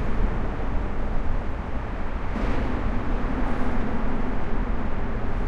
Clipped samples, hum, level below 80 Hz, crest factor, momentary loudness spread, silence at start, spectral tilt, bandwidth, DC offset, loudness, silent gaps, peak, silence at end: under 0.1%; none; -26 dBFS; 12 dB; 4 LU; 0 s; -8 dB/octave; 5 kHz; under 0.1%; -30 LUFS; none; -10 dBFS; 0 s